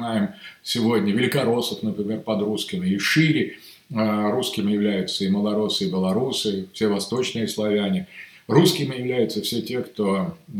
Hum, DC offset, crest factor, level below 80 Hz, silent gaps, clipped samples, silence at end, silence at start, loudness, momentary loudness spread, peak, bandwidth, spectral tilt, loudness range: none; under 0.1%; 20 dB; -64 dBFS; none; under 0.1%; 0 s; 0 s; -23 LUFS; 8 LU; -2 dBFS; 18 kHz; -5 dB/octave; 1 LU